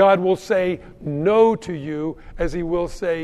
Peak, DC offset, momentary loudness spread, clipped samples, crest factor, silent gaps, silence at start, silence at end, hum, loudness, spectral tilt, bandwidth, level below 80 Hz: -4 dBFS; under 0.1%; 12 LU; under 0.1%; 16 dB; none; 0 s; 0 s; none; -21 LUFS; -7 dB/octave; 12.5 kHz; -38 dBFS